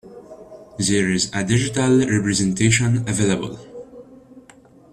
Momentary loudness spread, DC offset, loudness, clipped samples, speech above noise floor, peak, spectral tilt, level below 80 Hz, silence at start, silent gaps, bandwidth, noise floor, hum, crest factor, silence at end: 19 LU; under 0.1%; -19 LUFS; under 0.1%; 30 dB; -2 dBFS; -4.5 dB/octave; -48 dBFS; 0.05 s; none; 13 kHz; -48 dBFS; none; 18 dB; 0.55 s